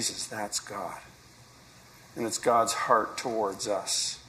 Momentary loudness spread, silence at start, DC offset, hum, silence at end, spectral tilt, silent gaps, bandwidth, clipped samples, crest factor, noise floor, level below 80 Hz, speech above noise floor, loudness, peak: 13 LU; 0 s; under 0.1%; none; 0 s; -2 dB/octave; none; 15.5 kHz; under 0.1%; 24 dB; -54 dBFS; -66 dBFS; 25 dB; -29 LUFS; -8 dBFS